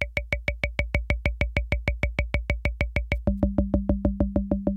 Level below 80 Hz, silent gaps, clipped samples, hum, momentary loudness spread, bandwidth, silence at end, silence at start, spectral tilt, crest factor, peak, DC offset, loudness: -30 dBFS; none; under 0.1%; none; 3 LU; 8.2 kHz; 0 s; 0 s; -7.5 dB/octave; 18 dB; -8 dBFS; under 0.1%; -27 LUFS